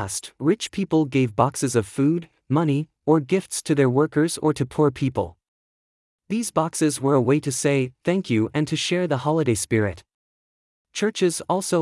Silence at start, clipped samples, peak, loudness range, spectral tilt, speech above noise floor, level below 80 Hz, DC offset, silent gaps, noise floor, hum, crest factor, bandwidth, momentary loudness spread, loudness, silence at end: 0 s; under 0.1%; -4 dBFS; 2 LU; -5.5 dB/octave; over 68 dB; -58 dBFS; under 0.1%; 5.48-6.19 s, 10.14-10.85 s; under -90 dBFS; none; 18 dB; 12 kHz; 6 LU; -22 LUFS; 0 s